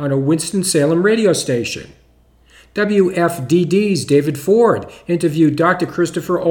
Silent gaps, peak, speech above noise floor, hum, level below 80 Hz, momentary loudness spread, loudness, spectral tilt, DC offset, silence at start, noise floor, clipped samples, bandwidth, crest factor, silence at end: none; 0 dBFS; 36 dB; none; -52 dBFS; 7 LU; -16 LUFS; -5.5 dB/octave; under 0.1%; 0 s; -51 dBFS; under 0.1%; 18.5 kHz; 14 dB; 0 s